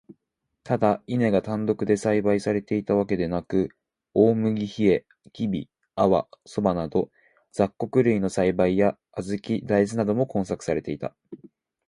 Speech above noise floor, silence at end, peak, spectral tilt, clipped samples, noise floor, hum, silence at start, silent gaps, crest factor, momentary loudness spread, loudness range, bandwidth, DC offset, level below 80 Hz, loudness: 56 dB; 0.5 s; -6 dBFS; -7.5 dB/octave; under 0.1%; -79 dBFS; none; 0.1 s; none; 18 dB; 10 LU; 2 LU; 11 kHz; under 0.1%; -54 dBFS; -24 LUFS